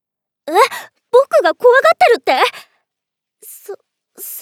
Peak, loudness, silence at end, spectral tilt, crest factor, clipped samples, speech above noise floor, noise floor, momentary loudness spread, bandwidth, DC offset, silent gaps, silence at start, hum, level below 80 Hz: 0 dBFS; -12 LUFS; 0 s; -1 dB/octave; 16 dB; under 0.1%; 69 dB; -81 dBFS; 23 LU; 18 kHz; under 0.1%; none; 0.45 s; none; -72 dBFS